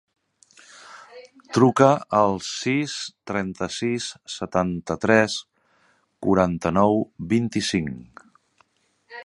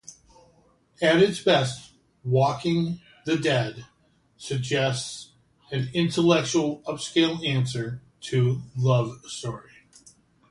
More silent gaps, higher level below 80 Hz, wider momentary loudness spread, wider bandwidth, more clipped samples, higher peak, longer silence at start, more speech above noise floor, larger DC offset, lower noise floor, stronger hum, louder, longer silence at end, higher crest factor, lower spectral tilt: neither; first, -52 dBFS vs -60 dBFS; about the same, 15 LU vs 15 LU; about the same, 11.5 kHz vs 11.5 kHz; neither; first, 0 dBFS vs -6 dBFS; first, 0.85 s vs 0.1 s; first, 42 dB vs 38 dB; neither; about the same, -64 dBFS vs -62 dBFS; neither; first, -22 LUFS vs -25 LUFS; second, 0 s vs 0.9 s; about the same, 24 dB vs 20 dB; about the same, -5.5 dB/octave vs -5.5 dB/octave